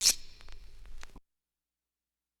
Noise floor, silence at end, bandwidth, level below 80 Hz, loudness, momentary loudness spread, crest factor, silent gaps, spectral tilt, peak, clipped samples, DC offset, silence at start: under -90 dBFS; 1.2 s; 19 kHz; -52 dBFS; -29 LUFS; 25 LU; 28 dB; none; 2 dB/octave; -8 dBFS; under 0.1%; under 0.1%; 0 s